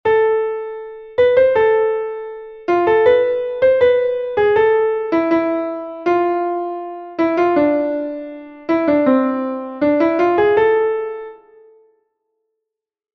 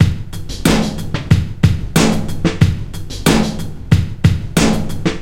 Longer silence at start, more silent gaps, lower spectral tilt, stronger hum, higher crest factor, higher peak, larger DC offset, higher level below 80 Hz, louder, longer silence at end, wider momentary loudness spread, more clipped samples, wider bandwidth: about the same, 0.05 s vs 0 s; neither; first, -7.5 dB/octave vs -5.5 dB/octave; neither; about the same, 14 dB vs 14 dB; about the same, -2 dBFS vs 0 dBFS; neither; second, -54 dBFS vs -26 dBFS; about the same, -16 LUFS vs -16 LUFS; first, 1.8 s vs 0 s; first, 14 LU vs 10 LU; neither; second, 6 kHz vs 17 kHz